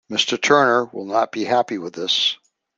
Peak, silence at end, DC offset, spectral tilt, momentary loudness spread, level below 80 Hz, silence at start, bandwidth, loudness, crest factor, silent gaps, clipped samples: 0 dBFS; 0.4 s; under 0.1%; -2.5 dB/octave; 10 LU; -68 dBFS; 0.1 s; 9.8 kHz; -19 LUFS; 20 dB; none; under 0.1%